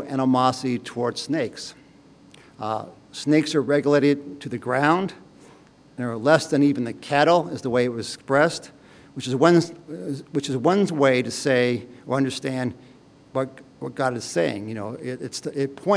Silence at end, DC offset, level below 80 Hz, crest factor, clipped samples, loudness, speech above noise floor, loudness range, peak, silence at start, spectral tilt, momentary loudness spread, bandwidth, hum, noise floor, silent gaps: 0 s; under 0.1%; -66 dBFS; 22 dB; under 0.1%; -23 LUFS; 29 dB; 5 LU; -2 dBFS; 0 s; -5.5 dB/octave; 13 LU; 10.5 kHz; none; -51 dBFS; none